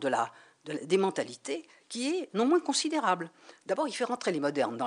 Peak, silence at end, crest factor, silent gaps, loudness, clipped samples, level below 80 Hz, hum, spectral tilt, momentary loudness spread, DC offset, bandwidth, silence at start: -12 dBFS; 0 s; 18 dB; none; -31 LUFS; under 0.1%; -86 dBFS; none; -3.5 dB/octave; 13 LU; under 0.1%; 11 kHz; 0 s